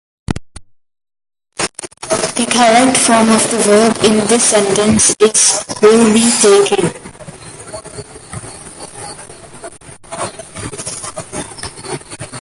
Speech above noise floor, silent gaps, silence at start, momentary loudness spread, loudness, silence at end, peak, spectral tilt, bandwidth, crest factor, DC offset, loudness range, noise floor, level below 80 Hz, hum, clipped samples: 27 dB; none; 0.3 s; 22 LU; -11 LUFS; 0 s; 0 dBFS; -3 dB/octave; 11.5 kHz; 14 dB; under 0.1%; 18 LU; -38 dBFS; -42 dBFS; none; under 0.1%